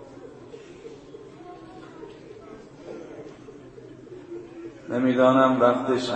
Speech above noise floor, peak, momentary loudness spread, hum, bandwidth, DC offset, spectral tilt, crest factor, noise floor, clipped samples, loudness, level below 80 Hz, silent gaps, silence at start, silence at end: 24 dB; -4 dBFS; 26 LU; none; 8.8 kHz; under 0.1%; -6.5 dB/octave; 22 dB; -44 dBFS; under 0.1%; -21 LUFS; -64 dBFS; none; 0 s; 0 s